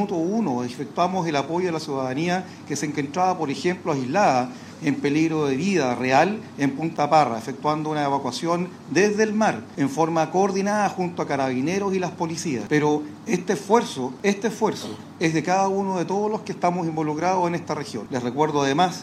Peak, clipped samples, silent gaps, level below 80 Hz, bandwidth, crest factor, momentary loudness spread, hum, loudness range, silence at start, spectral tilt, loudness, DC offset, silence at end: -4 dBFS; under 0.1%; none; -68 dBFS; 14 kHz; 20 dB; 7 LU; none; 2 LU; 0 s; -5.5 dB/octave; -23 LUFS; under 0.1%; 0 s